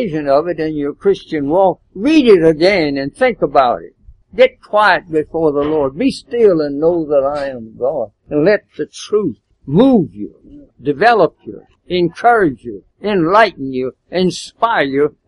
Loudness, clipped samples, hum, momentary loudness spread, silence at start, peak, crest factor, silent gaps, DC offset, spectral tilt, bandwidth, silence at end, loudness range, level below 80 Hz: -14 LUFS; under 0.1%; none; 13 LU; 0 s; 0 dBFS; 14 dB; none; under 0.1%; -6 dB/octave; 11.5 kHz; 0.15 s; 3 LU; -46 dBFS